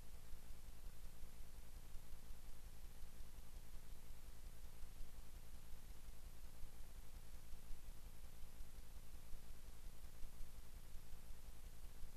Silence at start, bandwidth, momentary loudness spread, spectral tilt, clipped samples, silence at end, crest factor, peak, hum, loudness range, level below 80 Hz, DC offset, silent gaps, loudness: 0 s; 14 kHz; 1 LU; -4 dB/octave; under 0.1%; 0 s; 14 dB; -34 dBFS; none; 0 LU; -56 dBFS; under 0.1%; none; -62 LUFS